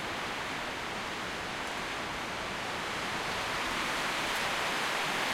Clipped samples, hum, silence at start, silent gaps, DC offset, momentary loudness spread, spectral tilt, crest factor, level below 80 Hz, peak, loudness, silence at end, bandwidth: under 0.1%; none; 0 s; none; under 0.1%; 5 LU; -2 dB/octave; 14 dB; -56 dBFS; -20 dBFS; -33 LUFS; 0 s; 16.5 kHz